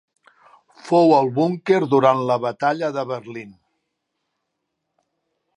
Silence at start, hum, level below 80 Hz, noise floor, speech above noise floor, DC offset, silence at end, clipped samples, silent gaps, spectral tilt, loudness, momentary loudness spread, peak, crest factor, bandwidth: 0.85 s; none; -72 dBFS; -77 dBFS; 59 dB; under 0.1%; 2.05 s; under 0.1%; none; -7 dB/octave; -19 LUFS; 14 LU; -2 dBFS; 20 dB; 10 kHz